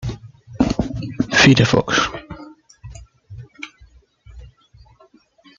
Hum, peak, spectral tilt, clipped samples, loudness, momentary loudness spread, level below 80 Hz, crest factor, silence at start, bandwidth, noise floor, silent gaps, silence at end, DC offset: none; 0 dBFS; -4.5 dB/octave; under 0.1%; -16 LUFS; 28 LU; -40 dBFS; 22 dB; 0 s; 7.6 kHz; -53 dBFS; none; 1.15 s; under 0.1%